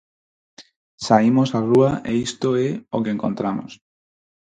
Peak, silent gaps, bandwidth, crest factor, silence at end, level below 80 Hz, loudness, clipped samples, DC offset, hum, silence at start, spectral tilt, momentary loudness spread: -2 dBFS; 0.76-0.98 s; 9.4 kHz; 20 dB; 0.75 s; -56 dBFS; -20 LUFS; under 0.1%; under 0.1%; none; 0.6 s; -6.5 dB/octave; 10 LU